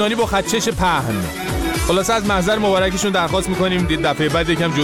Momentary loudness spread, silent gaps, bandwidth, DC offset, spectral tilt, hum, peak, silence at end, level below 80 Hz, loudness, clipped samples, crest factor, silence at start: 4 LU; none; 18.5 kHz; under 0.1%; -4.5 dB/octave; none; -4 dBFS; 0 s; -32 dBFS; -18 LUFS; under 0.1%; 12 dB; 0 s